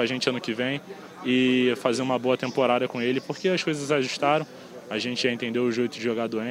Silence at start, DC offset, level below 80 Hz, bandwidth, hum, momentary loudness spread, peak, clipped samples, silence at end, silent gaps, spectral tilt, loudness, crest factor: 0 s; under 0.1%; -74 dBFS; 15 kHz; none; 7 LU; -8 dBFS; under 0.1%; 0 s; none; -4.5 dB/octave; -25 LUFS; 18 dB